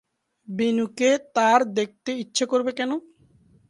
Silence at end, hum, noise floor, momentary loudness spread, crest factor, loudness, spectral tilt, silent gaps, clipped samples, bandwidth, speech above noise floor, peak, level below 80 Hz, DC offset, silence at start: 0.7 s; none; -58 dBFS; 10 LU; 20 dB; -23 LUFS; -3.5 dB/octave; none; under 0.1%; 11.5 kHz; 35 dB; -4 dBFS; -72 dBFS; under 0.1%; 0.5 s